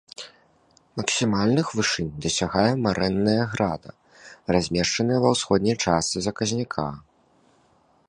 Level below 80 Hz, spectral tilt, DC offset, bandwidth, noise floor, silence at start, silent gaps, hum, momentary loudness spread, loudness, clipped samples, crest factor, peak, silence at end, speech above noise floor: -50 dBFS; -4.5 dB/octave; under 0.1%; 11 kHz; -61 dBFS; 0.2 s; none; none; 13 LU; -23 LUFS; under 0.1%; 20 dB; -4 dBFS; 1.1 s; 38 dB